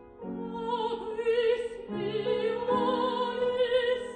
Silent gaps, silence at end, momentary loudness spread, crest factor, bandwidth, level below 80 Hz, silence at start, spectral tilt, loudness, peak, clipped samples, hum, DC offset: none; 0 s; 9 LU; 14 dB; 9.2 kHz; -62 dBFS; 0 s; -5.5 dB/octave; -29 LUFS; -16 dBFS; under 0.1%; none; under 0.1%